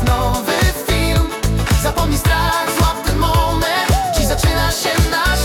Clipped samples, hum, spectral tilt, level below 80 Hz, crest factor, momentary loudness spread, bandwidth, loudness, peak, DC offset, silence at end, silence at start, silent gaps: under 0.1%; none; -4.5 dB/octave; -20 dBFS; 14 dB; 2 LU; 18 kHz; -16 LUFS; -2 dBFS; under 0.1%; 0 s; 0 s; none